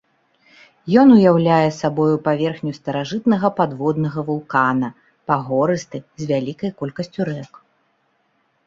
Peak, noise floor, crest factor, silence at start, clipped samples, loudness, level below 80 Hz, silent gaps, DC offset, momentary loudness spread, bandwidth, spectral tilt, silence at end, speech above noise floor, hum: -2 dBFS; -65 dBFS; 18 dB; 0.85 s; under 0.1%; -18 LUFS; -60 dBFS; none; under 0.1%; 14 LU; 7.6 kHz; -7.5 dB/octave; 1.2 s; 47 dB; none